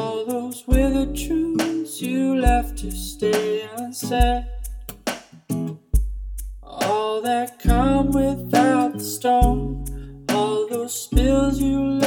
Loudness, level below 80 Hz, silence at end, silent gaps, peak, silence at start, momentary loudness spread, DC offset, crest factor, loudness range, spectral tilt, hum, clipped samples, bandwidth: -22 LUFS; -28 dBFS; 0 s; none; -4 dBFS; 0 s; 13 LU; under 0.1%; 18 dB; 6 LU; -5.5 dB/octave; none; under 0.1%; 19 kHz